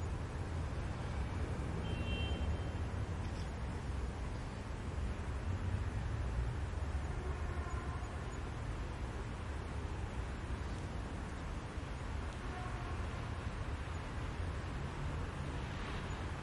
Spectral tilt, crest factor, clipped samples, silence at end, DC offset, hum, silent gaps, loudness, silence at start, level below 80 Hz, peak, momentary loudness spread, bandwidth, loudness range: -6.5 dB/octave; 14 dB; under 0.1%; 0 s; under 0.1%; none; none; -42 LUFS; 0 s; -44 dBFS; -26 dBFS; 4 LU; 11.5 kHz; 3 LU